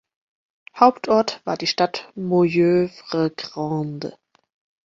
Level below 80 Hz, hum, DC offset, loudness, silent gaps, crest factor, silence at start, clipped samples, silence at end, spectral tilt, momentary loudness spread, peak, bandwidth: -62 dBFS; none; under 0.1%; -21 LUFS; none; 22 dB; 0.75 s; under 0.1%; 0.75 s; -6 dB/octave; 12 LU; 0 dBFS; 7.6 kHz